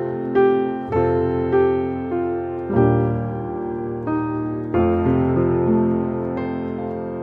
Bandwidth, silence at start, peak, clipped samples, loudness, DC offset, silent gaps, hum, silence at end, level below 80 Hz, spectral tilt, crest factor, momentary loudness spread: 4.3 kHz; 0 s; -6 dBFS; under 0.1%; -21 LUFS; under 0.1%; none; none; 0 s; -42 dBFS; -11 dB/octave; 14 dB; 9 LU